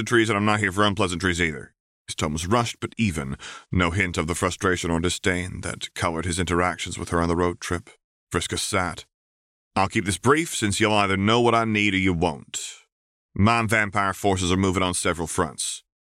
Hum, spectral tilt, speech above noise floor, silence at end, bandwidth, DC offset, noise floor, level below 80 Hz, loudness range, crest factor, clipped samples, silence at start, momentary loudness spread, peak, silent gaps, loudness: none; -4.5 dB/octave; over 67 dB; 0.35 s; 16 kHz; under 0.1%; under -90 dBFS; -44 dBFS; 4 LU; 18 dB; under 0.1%; 0 s; 11 LU; -6 dBFS; 1.80-2.05 s, 8.04-8.27 s, 9.14-9.71 s, 12.92-13.29 s; -23 LUFS